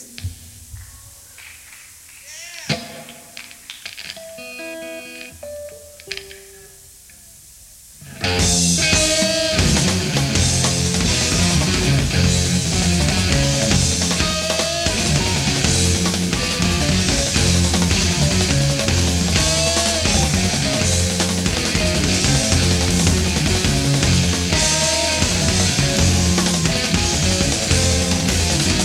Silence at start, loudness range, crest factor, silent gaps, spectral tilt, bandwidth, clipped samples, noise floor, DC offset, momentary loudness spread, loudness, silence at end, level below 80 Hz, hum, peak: 0 s; 16 LU; 16 dB; none; -3.5 dB/octave; 16.5 kHz; under 0.1%; -44 dBFS; under 0.1%; 17 LU; -16 LUFS; 0 s; -30 dBFS; none; -2 dBFS